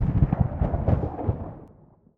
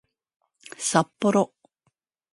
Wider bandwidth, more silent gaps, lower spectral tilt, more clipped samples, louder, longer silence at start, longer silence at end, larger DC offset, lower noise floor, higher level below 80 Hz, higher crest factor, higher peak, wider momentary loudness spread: second, 3.6 kHz vs 11.5 kHz; neither; first, -12 dB/octave vs -4.5 dB/octave; neither; about the same, -26 LUFS vs -24 LUFS; second, 0 s vs 0.8 s; second, 0.5 s vs 0.85 s; neither; second, -54 dBFS vs -74 dBFS; first, -30 dBFS vs -72 dBFS; second, 18 dB vs 24 dB; about the same, -6 dBFS vs -4 dBFS; first, 14 LU vs 8 LU